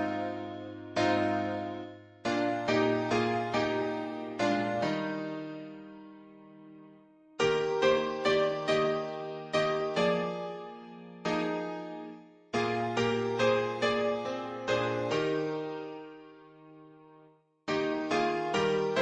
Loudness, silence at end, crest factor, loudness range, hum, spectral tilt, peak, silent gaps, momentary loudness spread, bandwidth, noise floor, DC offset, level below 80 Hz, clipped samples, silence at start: -31 LUFS; 0 s; 18 dB; 5 LU; none; -5 dB/octave; -14 dBFS; none; 16 LU; 10 kHz; -61 dBFS; under 0.1%; -66 dBFS; under 0.1%; 0 s